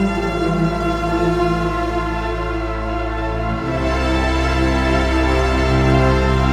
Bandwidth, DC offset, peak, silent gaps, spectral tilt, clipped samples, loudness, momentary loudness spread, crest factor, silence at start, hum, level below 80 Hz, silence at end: 11.5 kHz; under 0.1%; -2 dBFS; none; -6.5 dB/octave; under 0.1%; -18 LUFS; 7 LU; 16 dB; 0 s; none; -22 dBFS; 0 s